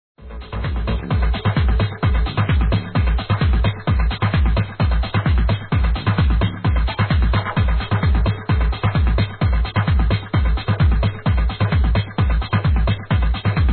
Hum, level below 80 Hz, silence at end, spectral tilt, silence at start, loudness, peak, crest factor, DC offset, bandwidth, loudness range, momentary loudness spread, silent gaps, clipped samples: none; -20 dBFS; 0 s; -10.5 dB/octave; 0.2 s; -19 LUFS; -6 dBFS; 10 dB; under 0.1%; 4.4 kHz; 0 LU; 2 LU; none; under 0.1%